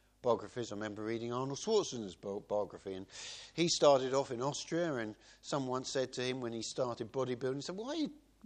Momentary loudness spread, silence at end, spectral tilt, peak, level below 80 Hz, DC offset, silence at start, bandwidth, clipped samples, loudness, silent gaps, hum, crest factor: 12 LU; 0.25 s; -4 dB/octave; -14 dBFS; -72 dBFS; under 0.1%; 0.25 s; 10 kHz; under 0.1%; -36 LUFS; none; none; 22 dB